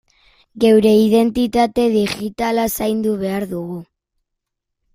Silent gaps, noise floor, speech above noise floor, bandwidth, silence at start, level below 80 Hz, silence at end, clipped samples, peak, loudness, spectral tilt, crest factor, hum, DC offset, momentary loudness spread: none; -78 dBFS; 62 dB; 16 kHz; 0.55 s; -48 dBFS; 1.1 s; under 0.1%; -2 dBFS; -16 LUFS; -5.5 dB/octave; 16 dB; none; under 0.1%; 12 LU